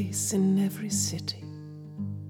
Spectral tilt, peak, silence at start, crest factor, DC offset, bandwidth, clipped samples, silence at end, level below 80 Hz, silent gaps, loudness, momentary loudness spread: -4.5 dB/octave; -16 dBFS; 0 s; 14 dB; under 0.1%; 17.5 kHz; under 0.1%; 0 s; -72 dBFS; none; -28 LUFS; 18 LU